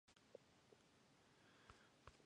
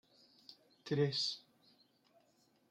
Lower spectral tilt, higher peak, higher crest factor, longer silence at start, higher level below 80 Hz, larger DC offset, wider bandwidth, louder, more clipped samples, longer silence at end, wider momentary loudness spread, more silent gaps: about the same, -4 dB/octave vs -5 dB/octave; second, -42 dBFS vs -22 dBFS; first, 28 dB vs 22 dB; second, 0.05 s vs 0.5 s; about the same, -82 dBFS vs -84 dBFS; neither; about the same, 10.5 kHz vs 9.8 kHz; second, -68 LUFS vs -37 LUFS; neither; second, 0 s vs 1.3 s; second, 1 LU vs 25 LU; neither